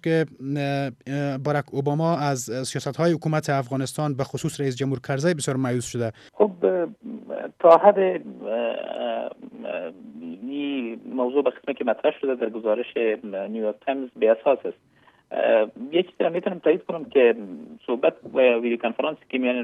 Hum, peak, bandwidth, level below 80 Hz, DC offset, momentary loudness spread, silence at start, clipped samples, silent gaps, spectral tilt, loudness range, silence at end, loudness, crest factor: none; -2 dBFS; 14 kHz; -68 dBFS; under 0.1%; 12 LU; 0.05 s; under 0.1%; none; -6 dB/octave; 5 LU; 0 s; -24 LUFS; 22 dB